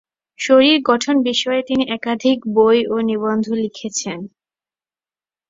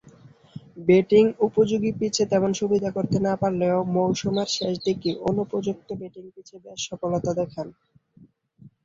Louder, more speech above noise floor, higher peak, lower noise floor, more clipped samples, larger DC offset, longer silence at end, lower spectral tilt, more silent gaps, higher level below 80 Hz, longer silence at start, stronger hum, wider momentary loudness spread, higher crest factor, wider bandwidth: first, -17 LUFS vs -23 LUFS; first, over 74 dB vs 32 dB; first, -2 dBFS vs -6 dBFS; first, under -90 dBFS vs -55 dBFS; neither; neither; first, 1.2 s vs 0.15 s; second, -3.5 dB/octave vs -5.5 dB/octave; neither; about the same, -60 dBFS vs -58 dBFS; second, 0.4 s vs 0.55 s; neither; second, 11 LU vs 16 LU; about the same, 16 dB vs 18 dB; about the same, 7.8 kHz vs 7.8 kHz